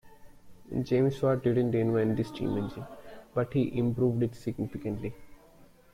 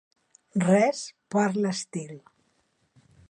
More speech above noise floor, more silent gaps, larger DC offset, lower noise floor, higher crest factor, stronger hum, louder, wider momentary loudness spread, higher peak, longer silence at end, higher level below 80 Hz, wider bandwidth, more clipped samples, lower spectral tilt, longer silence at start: second, 28 dB vs 45 dB; neither; neither; second, -57 dBFS vs -70 dBFS; second, 14 dB vs 20 dB; neither; second, -30 LUFS vs -26 LUFS; second, 11 LU vs 16 LU; second, -16 dBFS vs -8 dBFS; second, 0.3 s vs 1.1 s; first, -56 dBFS vs -72 dBFS; first, 15 kHz vs 10.5 kHz; neither; first, -9 dB/octave vs -5.5 dB/octave; second, 0.05 s vs 0.55 s